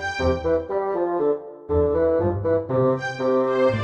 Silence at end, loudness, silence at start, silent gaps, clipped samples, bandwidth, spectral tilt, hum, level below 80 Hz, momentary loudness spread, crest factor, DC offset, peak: 0 s; -22 LUFS; 0 s; none; under 0.1%; 8.4 kHz; -7.5 dB/octave; none; -40 dBFS; 4 LU; 12 dB; under 0.1%; -8 dBFS